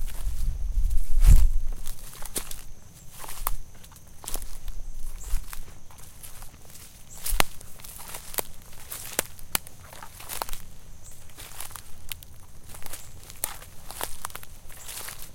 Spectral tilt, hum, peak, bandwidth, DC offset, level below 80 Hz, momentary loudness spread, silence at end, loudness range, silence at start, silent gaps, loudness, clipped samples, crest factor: -3 dB/octave; none; 0 dBFS; 17 kHz; under 0.1%; -28 dBFS; 19 LU; 0 s; 10 LU; 0 s; none; -32 LUFS; under 0.1%; 26 dB